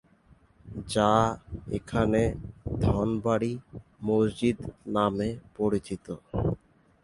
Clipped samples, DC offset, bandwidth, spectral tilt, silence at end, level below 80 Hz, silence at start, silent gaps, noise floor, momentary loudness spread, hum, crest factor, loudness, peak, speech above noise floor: under 0.1%; under 0.1%; 11.5 kHz; -7 dB/octave; 0.45 s; -44 dBFS; 0.65 s; none; -60 dBFS; 14 LU; none; 22 dB; -28 LUFS; -8 dBFS; 33 dB